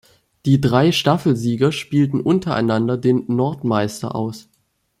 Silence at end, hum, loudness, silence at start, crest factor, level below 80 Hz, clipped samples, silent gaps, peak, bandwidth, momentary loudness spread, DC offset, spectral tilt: 0.6 s; none; -18 LUFS; 0.45 s; 16 dB; -52 dBFS; under 0.1%; none; -2 dBFS; 15 kHz; 9 LU; under 0.1%; -6.5 dB/octave